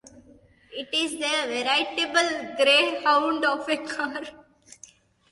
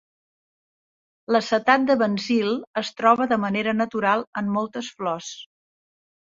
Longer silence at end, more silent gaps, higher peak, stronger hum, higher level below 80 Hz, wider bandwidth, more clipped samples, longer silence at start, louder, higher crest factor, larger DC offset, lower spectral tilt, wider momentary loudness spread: about the same, 0.95 s vs 0.85 s; second, none vs 2.67-2.74 s, 4.27-4.33 s; second, -8 dBFS vs -2 dBFS; neither; about the same, -68 dBFS vs -68 dBFS; first, 11.5 kHz vs 7.6 kHz; neither; second, 0.15 s vs 1.3 s; about the same, -23 LUFS vs -22 LUFS; about the same, 18 dB vs 22 dB; neither; second, -1 dB/octave vs -5 dB/octave; about the same, 13 LU vs 11 LU